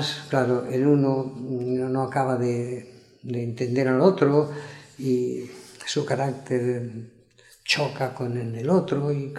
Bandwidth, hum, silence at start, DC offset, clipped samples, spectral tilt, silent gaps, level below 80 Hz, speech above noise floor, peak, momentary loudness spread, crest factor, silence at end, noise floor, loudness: 13 kHz; none; 0 s; under 0.1%; under 0.1%; -6 dB/octave; none; -68 dBFS; 31 dB; -6 dBFS; 15 LU; 20 dB; 0 s; -55 dBFS; -25 LUFS